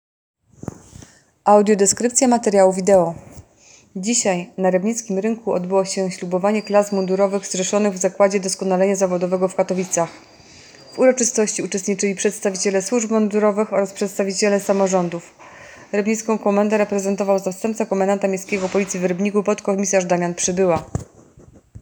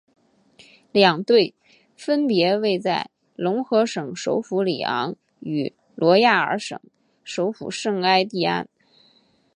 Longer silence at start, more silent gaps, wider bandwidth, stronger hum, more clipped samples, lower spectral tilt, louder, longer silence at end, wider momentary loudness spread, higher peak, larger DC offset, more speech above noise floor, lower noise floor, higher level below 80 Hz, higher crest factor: second, 0.65 s vs 0.95 s; neither; first, over 20 kHz vs 11 kHz; neither; neither; about the same, -4.5 dB/octave vs -5 dB/octave; about the same, -19 LUFS vs -21 LUFS; second, 0 s vs 0.9 s; second, 8 LU vs 14 LU; about the same, 0 dBFS vs -2 dBFS; neither; second, 32 dB vs 39 dB; second, -50 dBFS vs -60 dBFS; first, -56 dBFS vs -70 dBFS; about the same, 20 dB vs 22 dB